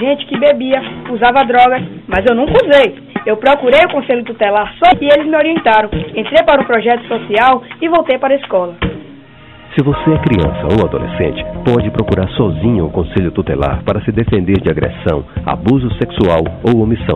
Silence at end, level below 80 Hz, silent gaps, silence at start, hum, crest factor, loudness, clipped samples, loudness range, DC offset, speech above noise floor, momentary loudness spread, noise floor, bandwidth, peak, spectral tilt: 0 s; -30 dBFS; none; 0 s; none; 12 dB; -12 LUFS; under 0.1%; 4 LU; 0.4%; 25 dB; 8 LU; -37 dBFS; 8.4 kHz; 0 dBFS; -8 dB/octave